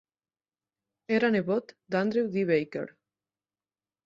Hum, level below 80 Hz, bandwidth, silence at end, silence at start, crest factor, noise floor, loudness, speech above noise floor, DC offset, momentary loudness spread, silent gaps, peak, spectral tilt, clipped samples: none; -72 dBFS; 7.6 kHz; 1.15 s; 1.1 s; 18 dB; under -90 dBFS; -28 LUFS; over 63 dB; under 0.1%; 11 LU; none; -12 dBFS; -7.5 dB/octave; under 0.1%